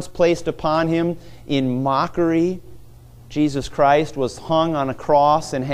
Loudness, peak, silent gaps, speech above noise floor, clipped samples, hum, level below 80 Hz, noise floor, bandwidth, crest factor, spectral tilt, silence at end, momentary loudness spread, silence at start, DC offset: -20 LUFS; -4 dBFS; none; 24 dB; under 0.1%; none; -44 dBFS; -43 dBFS; 14.5 kHz; 16 dB; -6.5 dB/octave; 0 s; 8 LU; 0 s; under 0.1%